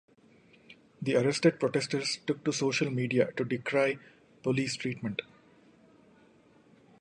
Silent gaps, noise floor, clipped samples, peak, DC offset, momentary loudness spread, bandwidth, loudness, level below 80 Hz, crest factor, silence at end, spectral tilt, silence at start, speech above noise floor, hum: none; -61 dBFS; under 0.1%; -10 dBFS; under 0.1%; 10 LU; 11 kHz; -30 LUFS; -72 dBFS; 22 dB; 1.8 s; -5 dB/octave; 0.7 s; 32 dB; none